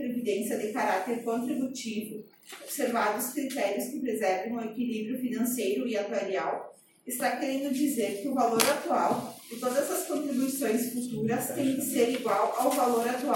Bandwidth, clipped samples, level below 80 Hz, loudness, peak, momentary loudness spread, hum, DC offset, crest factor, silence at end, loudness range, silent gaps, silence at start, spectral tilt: 17 kHz; under 0.1%; -76 dBFS; -29 LUFS; -2 dBFS; 8 LU; none; under 0.1%; 26 dB; 0 s; 3 LU; none; 0 s; -3.5 dB/octave